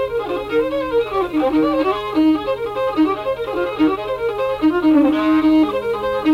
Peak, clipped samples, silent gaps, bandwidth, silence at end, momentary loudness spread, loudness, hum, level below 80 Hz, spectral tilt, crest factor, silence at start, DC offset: -4 dBFS; under 0.1%; none; 5.8 kHz; 0 s; 7 LU; -18 LUFS; none; -44 dBFS; -6.5 dB/octave; 12 dB; 0 s; under 0.1%